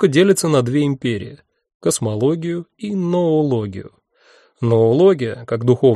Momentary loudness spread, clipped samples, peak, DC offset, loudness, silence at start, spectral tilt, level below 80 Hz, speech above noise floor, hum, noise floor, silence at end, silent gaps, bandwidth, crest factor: 12 LU; under 0.1%; -2 dBFS; under 0.1%; -17 LUFS; 0 s; -6 dB/octave; -58 dBFS; 37 dB; none; -53 dBFS; 0 s; 1.74-1.80 s; 13 kHz; 16 dB